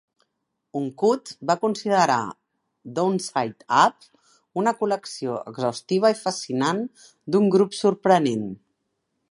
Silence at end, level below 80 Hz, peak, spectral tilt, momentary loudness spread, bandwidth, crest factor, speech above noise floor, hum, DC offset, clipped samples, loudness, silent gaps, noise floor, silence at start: 0.75 s; -72 dBFS; -4 dBFS; -5 dB/octave; 13 LU; 11.5 kHz; 20 dB; 55 dB; none; under 0.1%; under 0.1%; -23 LUFS; none; -78 dBFS; 0.75 s